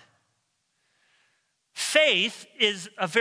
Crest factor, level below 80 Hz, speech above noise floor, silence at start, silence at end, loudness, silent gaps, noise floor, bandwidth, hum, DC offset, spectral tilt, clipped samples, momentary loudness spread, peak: 24 dB; -86 dBFS; 50 dB; 1.75 s; 0 s; -23 LUFS; none; -75 dBFS; 11 kHz; none; under 0.1%; -1.5 dB/octave; under 0.1%; 12 LU; -6 dBFS